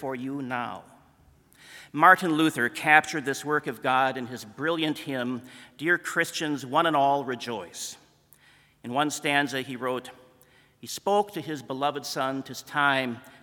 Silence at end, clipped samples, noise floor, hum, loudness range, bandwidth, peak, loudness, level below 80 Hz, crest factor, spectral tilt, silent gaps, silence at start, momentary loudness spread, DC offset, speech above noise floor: 0.1 s; under 0.1%; -59 dBFS; none; 7 LU; 18 kHz; -2 dBFS; -26 LUFS; -72 dBFS; 26 dB; -4 dB/octave; none; 0 s; 16 LU; under 0.1%; 33 dB